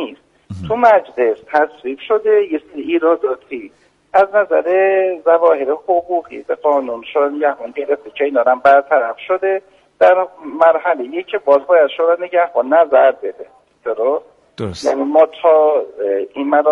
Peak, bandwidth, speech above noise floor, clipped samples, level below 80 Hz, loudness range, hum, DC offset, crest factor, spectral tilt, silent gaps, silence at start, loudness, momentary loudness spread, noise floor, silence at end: 0 dBFS; 7.6 kHz; 19 dB; under 0.1%; -58 dBFS; 3 LU; none; under 0.1%; 14 dB; -6 dB/octave; none; 0 s; -15 LUFS; 12 LU; -33 dBFS; 0 s